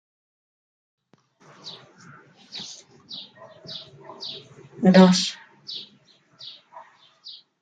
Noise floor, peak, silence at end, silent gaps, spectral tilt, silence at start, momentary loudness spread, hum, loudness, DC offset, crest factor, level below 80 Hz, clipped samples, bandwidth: -59 dBFS; -2 dBFS; 1.8 s; none; -5.5 dB/octave; 1.65 s; 28 LU; none; -20 LUFS; under 0.1%; 24 dB; -70 dBFS; under 0.1%; 9.2 kHz